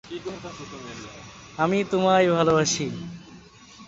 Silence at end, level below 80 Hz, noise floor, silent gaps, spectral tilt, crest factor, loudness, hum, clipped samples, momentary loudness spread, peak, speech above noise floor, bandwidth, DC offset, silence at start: 0 s; -56 dBFS; -48 dBFS; none; -4.5 dB/octave; 18 dB; -22 LUFS; none; under 0.1%; 21 LU; -8 dBFS; 24 dB; 8 kHz; under 0.1%; 0.05 s